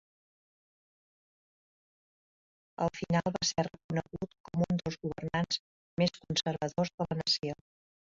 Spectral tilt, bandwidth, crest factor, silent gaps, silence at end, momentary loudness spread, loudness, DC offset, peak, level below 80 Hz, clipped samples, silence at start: -4.5 dB/octave; 7.8 kHz; 20 dB; 3.84-3.89 s, 4.40-4.44 s, 5.59-5.97 s, 6.94-6.98 s; 0.65 s; 10 LU; -33 LUFS; under 0.1%; -16 dBFS; -62 dBFS; under 0.1%; 2.8 s